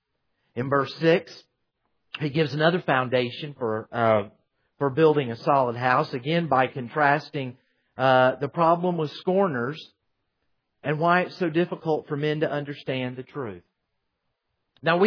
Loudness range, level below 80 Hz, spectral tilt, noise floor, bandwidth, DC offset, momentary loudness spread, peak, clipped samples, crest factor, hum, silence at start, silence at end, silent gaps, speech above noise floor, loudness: 4 LU; -70 dBFS; -7.5 dB/octave; -78 dBFS; 5.4 kHz; under 0.1%; 12 LU; -6 dBFS; under 0.1%; 20 dB; none; 0.55 s; 0 s; none; 54 dB; -24 LUFS